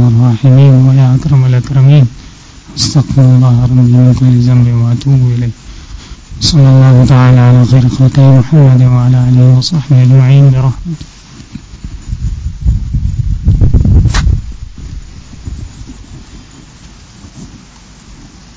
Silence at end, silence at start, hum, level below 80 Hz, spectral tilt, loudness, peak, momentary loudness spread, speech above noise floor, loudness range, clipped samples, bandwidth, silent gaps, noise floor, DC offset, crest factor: 0.4 s; 0 s; none; -20 dBFS; -7.5 dB/octave; -7 LUFS; 0 dBFS; 21 LU; 30 dB; 8 LU; 2%; 8 kHz; none; -35 dBFS; under 0.1%; 8 dB